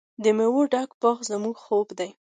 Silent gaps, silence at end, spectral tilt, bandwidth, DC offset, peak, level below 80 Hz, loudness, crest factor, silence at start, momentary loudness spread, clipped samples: 0.94-1.00 s; 0.25 s; -4.5 dB/octave; 9.4 kHz; under 0.1%; -8 dBFS; -78 dBFS; -24 LUFS; 16 dB; 0.2 s; 9 LU; under 0.1%